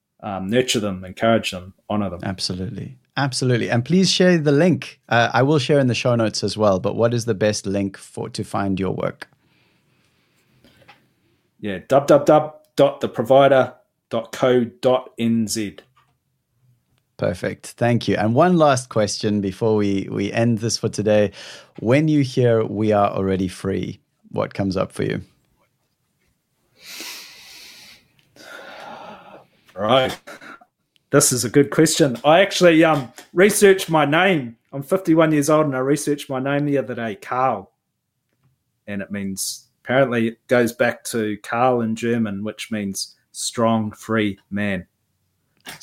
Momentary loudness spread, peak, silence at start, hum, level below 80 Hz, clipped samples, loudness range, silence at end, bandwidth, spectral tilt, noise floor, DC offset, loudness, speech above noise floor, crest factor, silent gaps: 16 LU; -2 dBFS; 0.2 s; none; -58 dBFS; under 0.1%; 12 LU; 0.05 s; 16.5 kHz; -5 dB/octave; -75 dBFS; under 0.1%; -19 LUFS; 56 dB; 18 dB; none